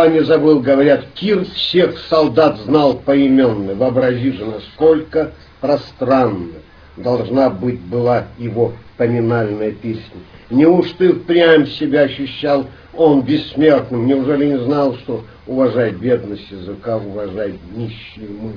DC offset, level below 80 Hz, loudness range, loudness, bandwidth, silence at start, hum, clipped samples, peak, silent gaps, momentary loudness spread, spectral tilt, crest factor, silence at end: under 0.1%; -46 dBFS; 5 LU; -15 LUFS; 5.4 kHz; 0 s; none; under 0.1%; 0 dBFS; none; 14 LU; -8.5 dB/octave; 16 dB; 0 s